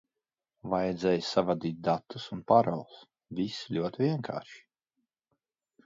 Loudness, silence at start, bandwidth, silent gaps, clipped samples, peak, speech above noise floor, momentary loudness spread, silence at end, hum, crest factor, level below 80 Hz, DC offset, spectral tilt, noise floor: -30 LUFS; 0.65 s; 7.8 kHz; none; under 0.1%; -8 dBFS; over 60 dB; 15 LU; 1.25 s; none; 24 dB; -66 dBFS; under 0.1%; -6.5 dB/octave; under -90 dBFS